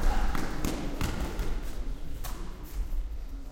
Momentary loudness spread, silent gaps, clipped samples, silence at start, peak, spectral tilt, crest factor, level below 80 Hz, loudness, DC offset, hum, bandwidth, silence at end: 8 LU; none; under 0.1%; 0 s; -12 dBFS; -5 dB/octave; 16 dB; -32 dBFS; -36 LUFS; under 0.1%; none; 16.5 kHz; 0 s